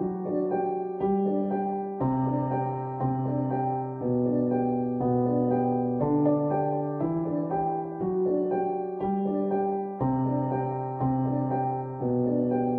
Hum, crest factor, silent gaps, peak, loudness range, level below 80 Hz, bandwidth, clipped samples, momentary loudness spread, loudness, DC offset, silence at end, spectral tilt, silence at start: none; 16 dB; none; -12 dBFS; 2 LU; -58 dBFS; 3.4 kHz; under 0.1%; 5 LU; -27 LUFS; under 0.1%; 0 s; -13.5 dB/octave; 0 s